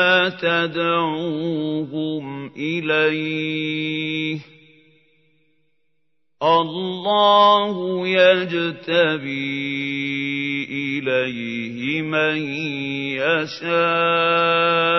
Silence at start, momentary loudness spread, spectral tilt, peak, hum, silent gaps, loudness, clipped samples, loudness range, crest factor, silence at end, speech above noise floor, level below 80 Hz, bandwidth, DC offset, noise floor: 0 s; 10 LU; -6 dB/octave; -2 dBFS; none; none; -20 LUFS; under 0.1%; 7 LU; 18 dB; 0 s; 56 dB; -70 dBFS; 6.2 kHz; under 0.1%; -76 dBFS